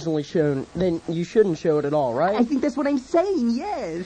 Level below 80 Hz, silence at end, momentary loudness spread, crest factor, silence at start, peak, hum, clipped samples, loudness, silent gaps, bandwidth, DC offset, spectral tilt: -52 dBFS; 0 s; 4 LU; 16 dB; 0 s; -6 dBFS; none; under 0.1%; -22 LUFS; none; 9.2 kHz; under 0.1%; -7 dB/octave